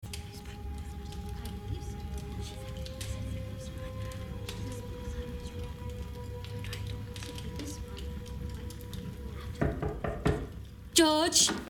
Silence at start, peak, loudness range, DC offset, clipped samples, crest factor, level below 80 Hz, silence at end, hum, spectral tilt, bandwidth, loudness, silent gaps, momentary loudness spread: 0 s; -8 dBFS; 9 LU; under 0.1%; under 0.1%; 28 dB; -42 dBFS; 0 s; none; -3.5 dB/octave; 17.5 kHz; -35 LUFS; none; 15 LU